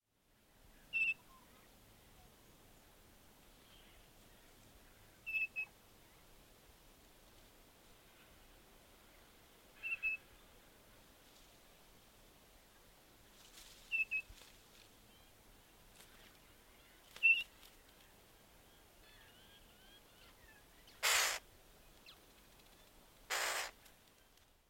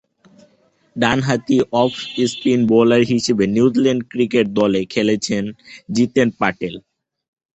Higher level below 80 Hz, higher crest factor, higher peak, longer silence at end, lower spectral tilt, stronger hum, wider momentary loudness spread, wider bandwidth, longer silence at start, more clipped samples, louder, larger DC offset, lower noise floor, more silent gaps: second, -70 dBFS vs -52 dBFS; first, 28 dB vs 16 dB; second, -18 dBFS vs 0 dBFS; first, 1 s vs 0.75 s; second, 0.5 dB/octave vs -5.5 dB/octave; neither; first, 28 LU vs 9 LU; first, 16.5 kHz vs 8.2 kHz; about the same, 0.95 s vs 0.95 s; neither; second, -37 LUFS vs -17 LUFS; neither; first, -74 dBFS vs -58 dBFS; neither